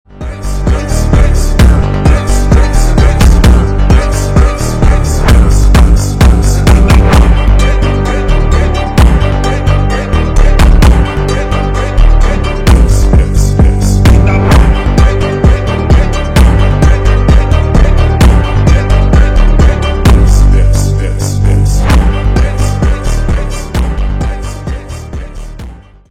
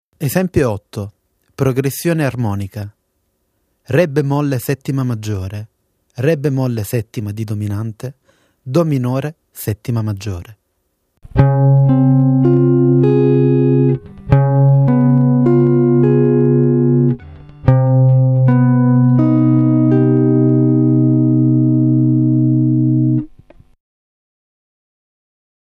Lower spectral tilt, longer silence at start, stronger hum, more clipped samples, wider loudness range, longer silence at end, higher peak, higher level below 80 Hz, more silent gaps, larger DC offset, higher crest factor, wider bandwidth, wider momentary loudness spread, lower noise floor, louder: second, -6.5 dB/octave vs -9 dB/octave; about the same, 0.15 s vs 0.2 s; neither; first, 1% vs under 0.1%; second, 3 LU vs 9 LU; second, 0.35 s vs 2.55 s; about the same, 0 dBFS vs 0 dBFS; first, -8 dBFS vs -42 dBFS; neither; first, 1% vs under 0.1%; second, 6 dB vs 14 dB; about the same, 14.5 kHz vs 15 kHz; second, 8 LU vs 12 LU; second, -28 dBFS vs -66 dBFS; first, -9 LUFS vs -14 LUFS